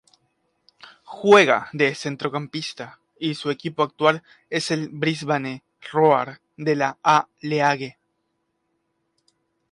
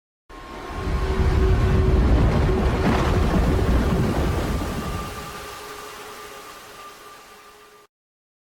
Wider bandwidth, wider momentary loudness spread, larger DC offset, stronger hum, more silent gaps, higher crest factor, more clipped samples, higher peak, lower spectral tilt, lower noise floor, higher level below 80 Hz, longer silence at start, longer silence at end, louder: second, 11.5 kHz vs 17.5 kHz; second, 15 LU vs 20 LU; neither; neither; neither; first, 20 dB vs 14 dB; neither; first, -2 dBFS vs -8 dBFS; second, -5 dB/octave vs -7 dB/octave; first, -74 dBFS vs -48 dBFS; second, -70 dBFS vs -26 dBFS; first, 1.1 s vs 0.3 s; first, 1.8 s vs 0.95 s; about the same, -21 LUFS vs -22 LUFS